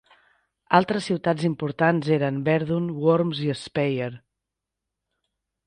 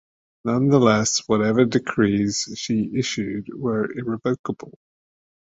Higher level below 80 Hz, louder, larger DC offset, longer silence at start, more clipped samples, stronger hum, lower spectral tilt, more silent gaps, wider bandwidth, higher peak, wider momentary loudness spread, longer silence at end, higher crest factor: second, -62 dBFS vs -56 dBFS; about the same, -23 LUFS vs -21 LUFS; neither; first, 0.7 s vs 0.45 s; neither; neither; first, -7 dB/octave vs -5 dB/octave; second, none vs 4.39-4.44 s; first, 10 kHz vs 8 kHz; about the same, -2 dBFS vs -2 dBFS; second, 6 LU vs 11 LU; first, 1.5 s vs 0.9 s; about the same, 22 dB vs 20 dB